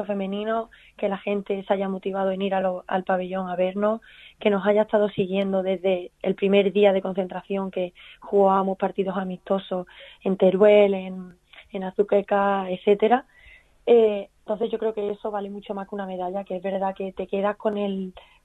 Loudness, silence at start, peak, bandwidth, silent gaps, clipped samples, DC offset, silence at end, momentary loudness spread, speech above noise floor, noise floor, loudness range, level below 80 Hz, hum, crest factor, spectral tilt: -24 LUFS; 0 s; -4 dBFS; 4.1 kHz; none; under 0.1%; under 0.1%; 0.25 s; 13 LU; 29 dB; -52 dBFS; 5 LU; -62 dBFS; none; 18 dB; -8.5 dB/octave